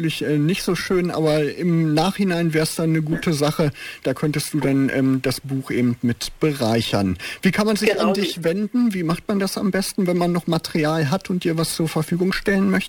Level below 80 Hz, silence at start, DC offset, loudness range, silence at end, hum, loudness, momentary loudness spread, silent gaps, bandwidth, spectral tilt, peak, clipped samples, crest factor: -46 dBFS; 0 s; under 0.1%; 1 LU; 0 s; none; -21 LUFS; 4 LU; none; 19 kHz; -5.5 dB/octave; -4 dBFS; under 0.1%; 16 dB